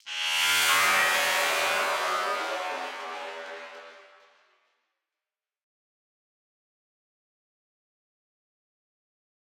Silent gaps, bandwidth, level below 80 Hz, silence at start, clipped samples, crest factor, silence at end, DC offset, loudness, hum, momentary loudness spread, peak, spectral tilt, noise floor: none; 16.5 kHz; -78 dBFS; 0.05 s; under 0.1%; 22 dB; 5.6 s; under 0.1%; -24 LUFS; none; 19 LU; -10 dBFS; 1 dB/octave; under -90 dBFS